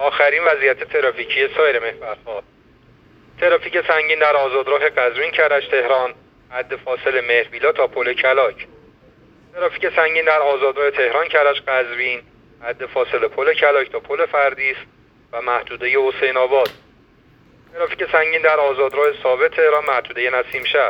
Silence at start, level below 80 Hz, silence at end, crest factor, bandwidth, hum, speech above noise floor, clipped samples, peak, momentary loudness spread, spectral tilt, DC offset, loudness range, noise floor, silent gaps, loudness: 0 s; -58 dBFS; 0 s; 18 dB; 17.5 kHz; none; 34 dB; under 0.1%; 0 dBFS; 11 LU; -4.5 dB/octave; under 0.1%; 2 LU; -51 dBFS; none; -17 LUFS